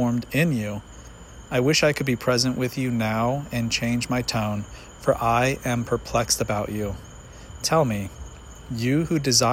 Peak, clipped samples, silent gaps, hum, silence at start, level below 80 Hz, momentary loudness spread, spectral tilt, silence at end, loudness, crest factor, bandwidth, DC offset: -4 dBFS; under 0.1%; none; none; 0 s; -44 dBFS; 21 LU; -4.5 dB/octave; 0 s; -23 LUFS; 20 dB; 16.5 kHz; under 0.1%